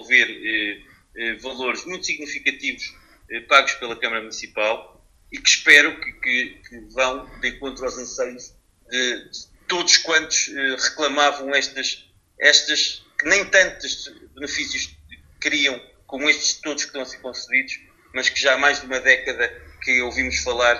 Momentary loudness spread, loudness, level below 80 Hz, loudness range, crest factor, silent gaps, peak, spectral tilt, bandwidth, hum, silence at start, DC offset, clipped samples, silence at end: 16 LU; -19 LUFS; -52 dBFS; 5 LU; 22 dB; none; 0 dBFS; 0 dB/octave; 13 kHz; none; 0 s; under 0.1%; under 0.1%; 0 s